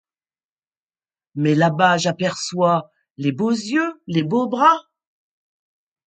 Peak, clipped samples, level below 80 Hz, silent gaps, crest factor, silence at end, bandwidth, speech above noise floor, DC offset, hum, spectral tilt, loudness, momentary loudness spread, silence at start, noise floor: 0 dBFS; under 0.1%; -68 dBFS; 3.11-3.15 s; 20 dB; 1.25 s; 9.2 kHz; over 72 dB; under 0.1%; none; -5.5 dB/octave; -19 LUFS; 8 LU; 1.35 s; under -90 dBFS